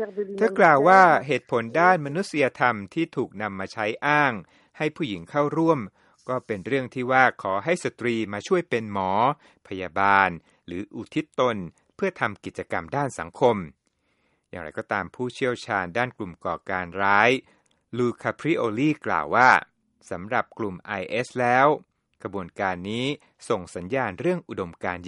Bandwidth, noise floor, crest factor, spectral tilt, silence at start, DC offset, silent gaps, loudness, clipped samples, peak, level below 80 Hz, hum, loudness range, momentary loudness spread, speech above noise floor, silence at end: 11.5 kHz; -71 dBFS; 22 dB; -5.5 dB/octave; 0 s; under 0.1%; none; -24 LUFS; under 0.1%; -2 dBFS; -64 dBFS; none; 6 LU; 16 LU; 47 dB; 0 s